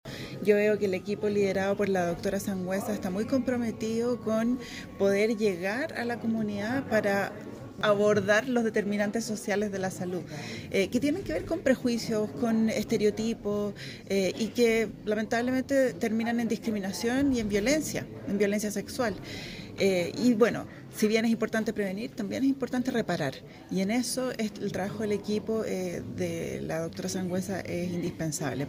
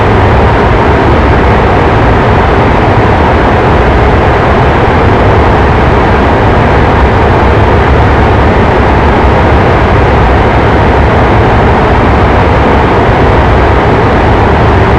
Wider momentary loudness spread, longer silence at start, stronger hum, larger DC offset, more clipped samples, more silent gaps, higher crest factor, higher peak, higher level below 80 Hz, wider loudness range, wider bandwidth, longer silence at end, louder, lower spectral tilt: first, 9 LU vs 0 LU; about the same, 0.05 s vs 0 s; neither; neither; neither; neither; first, 20 dB vs 4 dB; second, -10 dBFS vs 0 dBFS; second, -56 dBFS vs -12 dBFS; first, 3 LU vs 0 LU; first, 16 kHz vs 8.8 kHz; about the same, 0 s vs 0 s; second, -29 LUFS vs -6 LUFS; second, -5 dB/octave vs -8 dB/octave